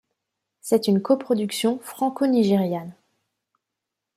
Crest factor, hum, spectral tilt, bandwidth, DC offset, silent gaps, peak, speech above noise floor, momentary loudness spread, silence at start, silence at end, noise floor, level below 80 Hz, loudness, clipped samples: 18 dB; none; -6 dB/octave; 15.5 kHz; under 0.1%; none; -6 dBFS; 63 dB; 10 LU; 0.65 s; 1.25 s; -84 dBFS; -70 dBFS; -22 LUFS; under 0.1%